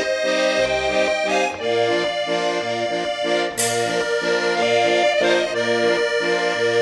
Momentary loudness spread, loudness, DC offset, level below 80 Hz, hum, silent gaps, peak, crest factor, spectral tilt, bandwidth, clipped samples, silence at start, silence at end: 4 LU; -19 LUFS; under 0.1%; -54 dBFS; none; none; -6 dBFS; 14 dB; -2.5 dB/octave; 12 kHz; under 0.1%; 0 s; 0 s